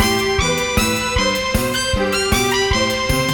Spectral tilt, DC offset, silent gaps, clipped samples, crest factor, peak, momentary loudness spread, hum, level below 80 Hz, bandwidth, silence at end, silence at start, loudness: -3.5 dB/octave; under 0.1%; none; under 0.1%; 16 dB; 0 dBFS; 2 LU; none; -30 dBFS; over 20 kHz; 0 s; 0 s; -17 LUFS